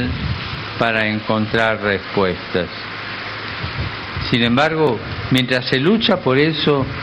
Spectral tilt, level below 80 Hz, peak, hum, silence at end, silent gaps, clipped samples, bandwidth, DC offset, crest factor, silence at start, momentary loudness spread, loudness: -6.5 dB/octave; -38 dBFS; -2 dBFS; none; 0 s; none; under 0.1%; 11.5 kHz; under 0.1%; 16 dB; 0 s; 10 LU; -18 LUFS